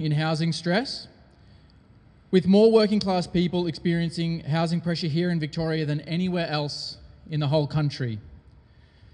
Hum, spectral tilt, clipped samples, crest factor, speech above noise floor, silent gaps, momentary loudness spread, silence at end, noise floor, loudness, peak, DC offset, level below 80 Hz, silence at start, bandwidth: none; -7 dB/octave; under 0.1%; 18 dB; 30 dB; none; 13 LU; 0.8 s; -54 dBFS; -24 LUFS; -6 dBFS; under 0.1%; -54 dBFS; 0 s; 10 kHz